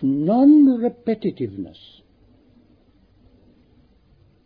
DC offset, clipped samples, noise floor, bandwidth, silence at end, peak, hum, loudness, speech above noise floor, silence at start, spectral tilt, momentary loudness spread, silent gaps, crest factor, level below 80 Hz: under 0.1%; under 0.1%; -56 dBFS; 4.7 kHz; 2.8 s; -6 dBFS; none; -17 LUFS; 37 dB; 0 s; -11.5 dB/octave; 19 LU; none; 16 dB; -60 dBFS